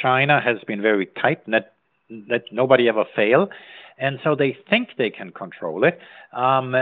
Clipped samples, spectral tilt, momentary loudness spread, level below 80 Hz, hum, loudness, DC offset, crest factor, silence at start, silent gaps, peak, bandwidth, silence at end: under 0.1%; -3.5 dB/octave; 15 LU; -74 dBFS; none; -20 LUFS; under 0.1%; 20 dB; 0 s; none; -2 dBFS; 4.6 kHz; 0 s